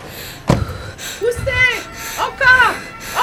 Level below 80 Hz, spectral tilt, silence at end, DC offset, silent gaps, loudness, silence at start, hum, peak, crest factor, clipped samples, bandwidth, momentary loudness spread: -34 dBFS; -3.5 dB/octave; 0 s; under 0.1%; none; -15 LUFS; 0 s; none; 0 dBFS; 18 dB; under 0.1%; 18 kHz; 16 LU